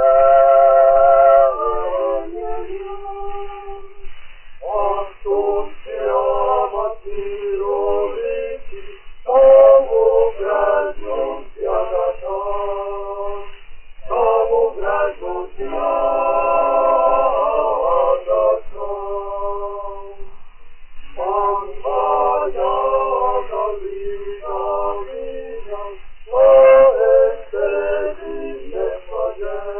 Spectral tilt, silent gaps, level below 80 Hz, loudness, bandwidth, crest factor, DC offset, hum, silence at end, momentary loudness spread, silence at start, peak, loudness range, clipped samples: -3 dB/octave; none; -38 dBFS; -17 LUFS; 3.2 kHz; 16 dB; under 0.1%; none; 0 s; 19 LU; 0 s; 0 dBFS; 9 LU; under 0.1%